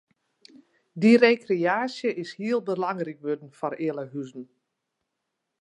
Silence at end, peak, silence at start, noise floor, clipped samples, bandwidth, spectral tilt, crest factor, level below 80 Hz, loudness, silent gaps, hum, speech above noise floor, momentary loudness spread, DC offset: 1.15 s; -4 dBFS; 0.95 s; -82 dBFS; under 0.1%; 9.8 kHz; -6.5 dB/octave; 22 dB; -82 dBFS; -25 LUFS; none; none; 57 dB; 18 LU; under 0.1%